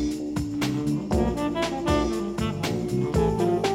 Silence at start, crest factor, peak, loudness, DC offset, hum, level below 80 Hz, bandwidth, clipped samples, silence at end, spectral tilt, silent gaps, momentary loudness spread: 0 s; 16 dB; -8 dBFS; -26 LUFS; under 0.1%; none; -38 dBFS; 16.5 kHz; under 0.1%; 0 s; -6 dB/octave; none; 5 LU